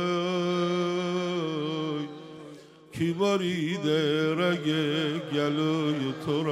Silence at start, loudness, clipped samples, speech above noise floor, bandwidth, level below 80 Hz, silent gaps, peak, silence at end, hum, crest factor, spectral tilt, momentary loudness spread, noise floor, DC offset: 0 s; -28 LUFS; under 0.1%; 21 dB; 14 kHz; -70 dBFS; none; -12 dBFS; 0 s; none; 14 dB; -6 dB/octave; 9 LU; -48 dBFS; under 0.1%